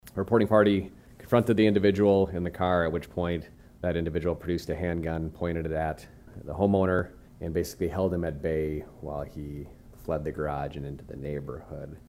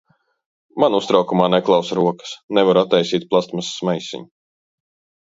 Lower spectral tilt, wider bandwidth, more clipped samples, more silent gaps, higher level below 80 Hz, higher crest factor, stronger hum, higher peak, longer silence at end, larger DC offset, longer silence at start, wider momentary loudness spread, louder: first, -7.5 dB/octave vs -5.5 dB/octave; first, 16 kHz vs 8 kHz; neither; second, none vs 2.43-2.48 s; first, -46 dBFS vs -64 dBFS; about the same, 20 dB vs 18 dB; neither; second, -8 dBFS vs 0 dBFS; second, 0.1 s vs 0.95 s; neither; second, 0.05 s vs 0.75 s; first, 17 LU vs 12 LU; second, -28 LUFS vs -18 LUFS